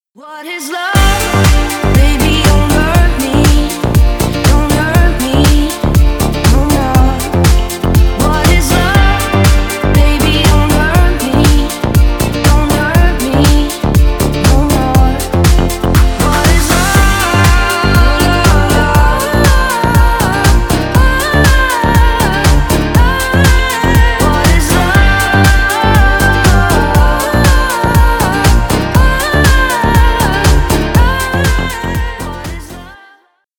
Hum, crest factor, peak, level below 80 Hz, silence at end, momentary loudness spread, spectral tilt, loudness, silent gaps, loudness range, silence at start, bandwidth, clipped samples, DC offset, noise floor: none; 8 dB; 0 dBFS; -12 dBFS; 0.65 s; 4 LU; -5 dB/octave; -10 LUFS; none; 2 LU; 0.25 s; over 20 kHz; under 0.1%; 0.3%; -48 dBFS